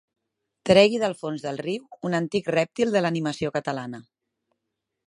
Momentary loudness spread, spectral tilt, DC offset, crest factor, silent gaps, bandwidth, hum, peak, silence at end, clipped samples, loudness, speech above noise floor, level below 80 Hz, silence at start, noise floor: 15 LU; -5.5 dB/octave; under 0.1%; 24 dB; none; 11 kHz; none; -2 dBFS; 1.05 s; under 0.1%; -24 LUFS; 58 dB; -62 dBFS; 0.65 s; -82 dBFS